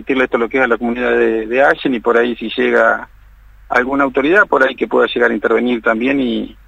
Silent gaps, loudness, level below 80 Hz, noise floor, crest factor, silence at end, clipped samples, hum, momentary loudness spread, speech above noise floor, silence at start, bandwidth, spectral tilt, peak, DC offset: none; -14 LUFS; -44 dBFS; -42 dBFS; 14 dB; 0.15 s; under 0.1%; none; 5 LU; 28 dB; 0 s; 8.4 kHz; -5.5 dB/octave; 0 dBFS; under 0.1%